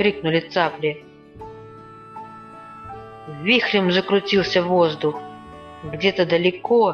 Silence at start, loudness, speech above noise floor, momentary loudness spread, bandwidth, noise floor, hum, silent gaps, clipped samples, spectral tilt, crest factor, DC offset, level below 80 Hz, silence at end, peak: 0 s; -19 LUFS; 22 dB; 22 LU; 6.8 kHz; -41 dBFS; none; none; under 0.1%; -6 dB/octave; 18 dB; under 0.1%; -54 dBFS; 0 s; -4 dBFS